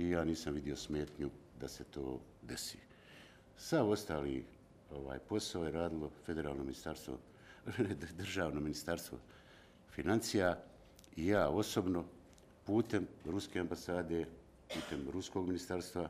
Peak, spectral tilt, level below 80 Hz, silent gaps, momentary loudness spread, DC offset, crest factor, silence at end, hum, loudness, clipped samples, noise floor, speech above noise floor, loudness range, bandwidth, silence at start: -20 dBFS; -5.5 dB/octave; -60 dBFS; none; 18 LU; under 0.1%; 20 dB; 0 s; none; -40 LUFS; under 0.1%; -61 dBFS; 23 dB; 5 LU; 15.5 kHz; 0 s